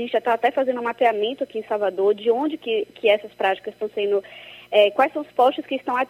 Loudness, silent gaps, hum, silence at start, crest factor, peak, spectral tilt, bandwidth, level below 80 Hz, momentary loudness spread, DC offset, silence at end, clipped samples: -22 LUFS; none; none; 0 s; 18 dB; -4 dBFS; -5 dB/octave; 15 kHz; -72 dBFS; 8 LU; under 0.1%; 0.05 s; under 0.1%